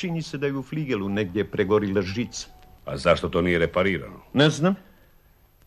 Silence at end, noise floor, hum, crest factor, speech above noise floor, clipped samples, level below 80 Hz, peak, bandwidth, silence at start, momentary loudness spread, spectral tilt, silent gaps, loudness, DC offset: 0.85 s; -57 dBFS; none; 20 dB; 33 dB; under 0.1%; -48 dBFS; -6 dBFS; 13 kHz; 0 s; 11 LU; -6 dB/octave; none; -24 LUFS; under 0.1%